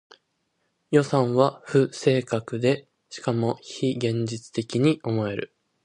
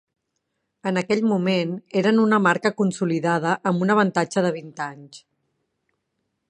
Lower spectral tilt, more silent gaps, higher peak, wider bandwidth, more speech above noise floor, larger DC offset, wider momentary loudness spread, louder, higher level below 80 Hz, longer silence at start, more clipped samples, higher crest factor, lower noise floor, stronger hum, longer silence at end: about the same, -6.5 dB/octave vs -6 dB/octave; neither; about the same, -4 dBFS vs -4 dBFS; about the same, 10.5 kHz vs 10 kHz; second, 50 dB vs 56 dB; neither; about the same, 9 LU vs 11 LU; second, -25 LUFS vs -21 LUFS; first, -64 dBFS vs -70 dBFS; about the same, 0.9 s vs 0.85 s; neither; about the same, 20 dB vs 20 dB; about the same, -74 dBFS vs -77 dBFS; neither; second, 0.4 s vs 1.3 s